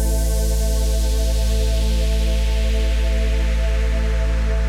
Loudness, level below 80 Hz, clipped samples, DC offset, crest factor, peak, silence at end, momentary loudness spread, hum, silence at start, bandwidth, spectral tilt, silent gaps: -21 LUFS; -18 dBFS; under 0.1%; under 0.1%; 8 dB; -8 dBFS; 0 s; 1 LU; none; 0 s; 15 kHz; -5 dB/octave; none